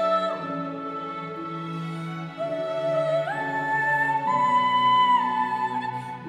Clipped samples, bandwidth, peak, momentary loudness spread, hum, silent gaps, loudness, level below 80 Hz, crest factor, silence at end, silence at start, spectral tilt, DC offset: under 0.1%; 10.5 kHz; -12 dBFS; 13 LU; none; none; -25 LUFS; -72 dBFS; 14 dB; 0 s; 0 s; -5.5 dB/octave; under 0.1%